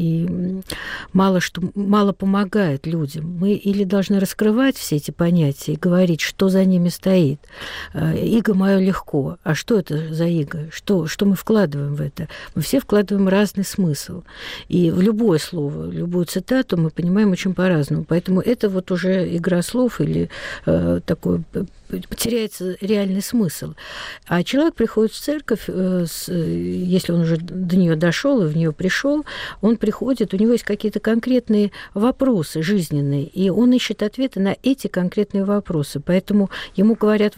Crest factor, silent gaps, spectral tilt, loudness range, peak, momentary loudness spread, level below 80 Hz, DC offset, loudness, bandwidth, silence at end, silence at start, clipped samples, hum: 10 dB; none; -6.5 dB/octave; 3 LU; -8 dBFS; 9 LU; -46 dBFS; under 0.1%; -19 LUFS; 16 kHz; 0.05 s; 0 s; under 0.1%; none